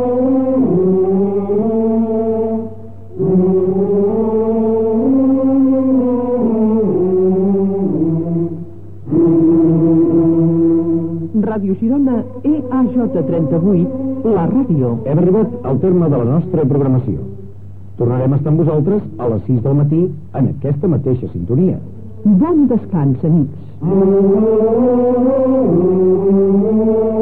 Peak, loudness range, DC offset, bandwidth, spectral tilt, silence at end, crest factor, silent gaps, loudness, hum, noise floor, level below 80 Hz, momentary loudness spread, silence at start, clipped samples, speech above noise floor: -4 dBFS; 3 LU; 2%; 3.2 kHz; -13.5 dB/octave; 0 s; 10 dB; none; -14 LUFS; none; -34 dBFS; -46 dBFS; 7 LU; 0 s; under 0.1%; 20 dB